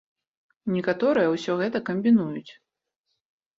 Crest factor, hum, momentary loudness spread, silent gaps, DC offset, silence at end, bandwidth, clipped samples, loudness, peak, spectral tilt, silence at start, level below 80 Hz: 16 dB; none; 12 LU; none; under 0.1%; 1.1 s; 7.6 kHz; under 0.1%; -24 LUFS; -10 dBFS; -7 dB/octave; 0.65 s; -68 dBFS